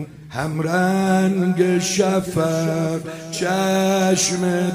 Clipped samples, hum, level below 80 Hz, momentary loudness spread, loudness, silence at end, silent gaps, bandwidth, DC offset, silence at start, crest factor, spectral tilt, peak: under 0.1%; none; -54 dBFS; 8 LU; -19 LUFS; 0 s; none; 16 kHz; under 0.1%; 0 s; 14 dB; -5 dB/octave; -4 dBFS